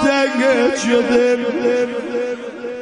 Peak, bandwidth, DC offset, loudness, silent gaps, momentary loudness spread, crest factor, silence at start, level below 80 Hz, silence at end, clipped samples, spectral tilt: -4 dBFS; 10.5 kHz; under 0.1%; -17 LUFS; none; 9 LU; 14 dB; 0 s; -54 dBFS; 0 s; under 0.1%; -3.5 dB/octave